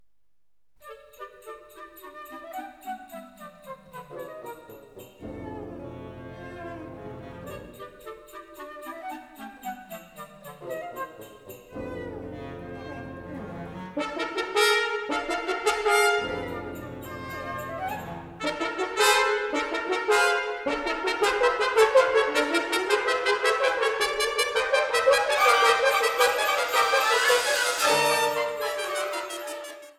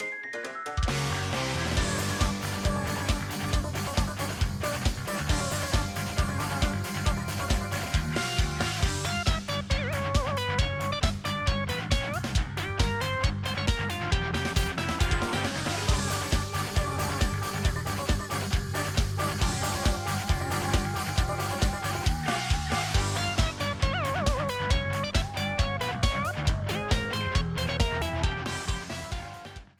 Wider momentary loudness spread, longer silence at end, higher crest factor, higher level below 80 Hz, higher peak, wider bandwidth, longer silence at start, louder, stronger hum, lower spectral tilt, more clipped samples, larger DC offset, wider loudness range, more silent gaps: first, 22 LU vs 3 LU; about the same, 0.05 s vs 0.15 s; about the same, 20 dB vs 18 dB; second, -58 dBFS vs -34 dBFS; first, -6 dBFS vs -10 dBFS; about the same, 19.5 kHz vs 19 kHz; first, 0.85 s vs 0 s; first, -24 LUFS vs -29 LUFS; neither; second, -2 dB/octave vs -4.5 dB/octave; neither; neither; first, 19 LU vs 1 LU; neither